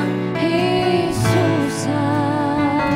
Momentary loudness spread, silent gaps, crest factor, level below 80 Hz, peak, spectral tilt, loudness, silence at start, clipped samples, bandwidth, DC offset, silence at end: 3 LU; none; 14 dB; -44 dBFS; -4 dBFS; -6 dB/octave; -18 LUFS; 0 s; under 0.1%; 16 kHz; under 0.1%; 0 s